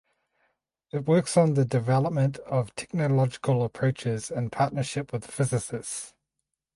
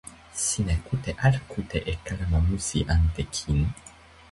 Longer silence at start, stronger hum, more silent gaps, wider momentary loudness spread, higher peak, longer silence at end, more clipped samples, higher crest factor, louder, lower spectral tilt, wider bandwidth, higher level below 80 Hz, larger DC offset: first, 0.95 s vs 0.05 s; neither; neither; first, 11 LU vs 7 LU; about the same, -10 dBFS vs -8 dBFS; first, 0.7 s vs 0.45 s; neither; about the same, 18 dB vs 18 dB; about the same, -27 LUFS vs -27 LUFS; first, -6.5 dB/octave vs -5 dB/octave; about the same, 11.5 kHz vs 11.5 kHz; second, -60 dBFS vs -32 dBFS; neither